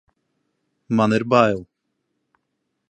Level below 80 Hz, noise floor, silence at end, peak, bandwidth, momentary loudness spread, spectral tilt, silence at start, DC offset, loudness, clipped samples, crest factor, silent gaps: -60 dBFS; -75 dBFS; 1.25 s; -2 dBFS; 9 kHz; 8 LU; -7 dB/octave; 0.9 s; under 0.1%; -19 LUFS; under 0.1%; 22 dB; none